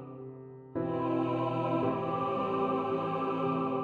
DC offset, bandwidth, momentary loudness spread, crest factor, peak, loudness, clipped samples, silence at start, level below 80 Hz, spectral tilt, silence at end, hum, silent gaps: under 0.1%; 6.8 kHz; 13 LU; 16 dB; -16 dBFS; -32 LUFS; under 0.1%; 0 s; -68 dBFS; -9 dB/octave; 0 s; none; none